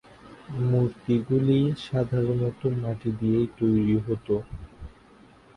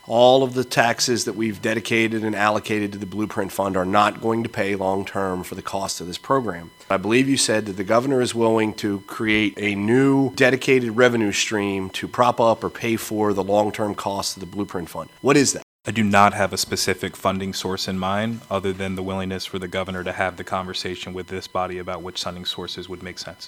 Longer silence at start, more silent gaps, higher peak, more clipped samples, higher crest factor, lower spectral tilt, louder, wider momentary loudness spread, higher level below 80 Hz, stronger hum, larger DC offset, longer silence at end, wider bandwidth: first, 0.25 s vs 0.05 s; second, none vs 15.62-15.79 s; second, -10 dBFS vs 0 dBFS; neither; second, 16 dB vs 22 dB; first, -9.5 dB/octave vs -4 dB/octave; second, -25 LUFS vs -21 LUFS; second, 7 LU vs 11 LU; first, -50 dBFS vs -58 dBFS; neither; neither; first, 0.7 s vs 0 s; second, 9 kHz vs 18.5 kHz